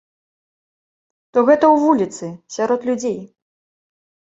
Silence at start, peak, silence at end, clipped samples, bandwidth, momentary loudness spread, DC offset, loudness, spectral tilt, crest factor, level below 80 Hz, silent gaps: 1.35 s; -2 dBFS; 1.1 s; under 0.1%; 8 kHz; 16 LU; under 0.1%; -17 LUFS; -5.5 dB/octave; 18 dB; -64 dBFS; none